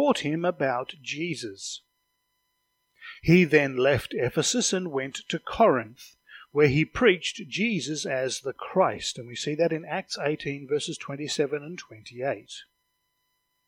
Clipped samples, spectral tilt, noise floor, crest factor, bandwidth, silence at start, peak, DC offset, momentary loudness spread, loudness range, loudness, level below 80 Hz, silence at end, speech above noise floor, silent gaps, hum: under 0.1%; -4.5 dB/octave; -76 dBFS; 22 dB; 16.5 kHz; 0 s; -6 dBFS; under 0.1%; 14 LU; 7 LU; -26 LUFS; -56 dBFS; 1.05 s; 50 dB; none; none